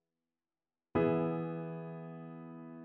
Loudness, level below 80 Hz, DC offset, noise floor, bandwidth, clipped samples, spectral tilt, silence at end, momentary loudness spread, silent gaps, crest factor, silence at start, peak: -36 LUFS; -66 dBFS; under 0.1%; under -90 dBFS; 4.1 kHz; under 0.1%; -8 dB/octave; 0 s; 16 LU; none; 18 dB; 0.95 s; -20 dBFS